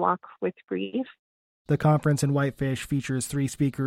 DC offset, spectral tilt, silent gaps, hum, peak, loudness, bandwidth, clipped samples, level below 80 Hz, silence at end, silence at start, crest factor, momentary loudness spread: under 0.1%; -6.5 dB/octave; 1.19-1.65 s; none; -8 dBFS; -27 LUFS; 15.5 kHz; under 0.1%; -54 dBFS; 0 s; 0 s; 18 dB; 10 LU